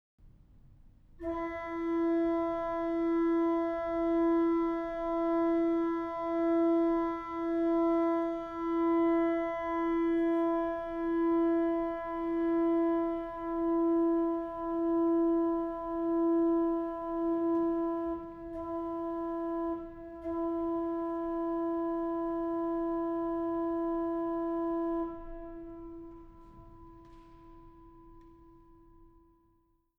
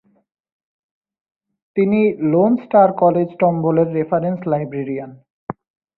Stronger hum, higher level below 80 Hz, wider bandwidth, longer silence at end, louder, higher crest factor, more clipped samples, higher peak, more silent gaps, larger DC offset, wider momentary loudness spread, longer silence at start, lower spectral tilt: neither; about the same, -56 dBFS vs -60 dBFS; about the same, 3.9 kHz vs 4.2 kHz; first, 1.7 s vs 0.45 s; second, -31 LUFS vs -17 LUFS; about the same, 12 dB vs 16 dB; neither; second, -20 dBFS vs -2 dBFS; second, none vs 5.30-5.47 s; neither; second, 9 LU vs 19 LU; second, 0.25 s vs 1.75 s; second, -8 dB/octave vs -13 dB/octave